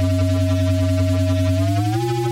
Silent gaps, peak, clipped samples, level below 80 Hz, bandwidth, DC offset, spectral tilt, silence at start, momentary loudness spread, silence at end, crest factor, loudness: none; -10 dBFS; under 0.1%; -46 dBFS; 15 kHz; under 0.1%; -7 dB/octave; 0 s; 1 LU; 0 s; 8 dB; -19 LUFS